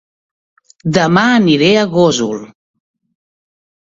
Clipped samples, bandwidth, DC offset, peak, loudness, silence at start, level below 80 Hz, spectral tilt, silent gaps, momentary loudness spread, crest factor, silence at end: under 0.1%; 7.8 kHz; under 0.1%; 0 dBFS; -12 LUFS; 0.85 s; -52 dBFS; -5 dB/octave; none; 11 LU; 14 dB; 1.4 s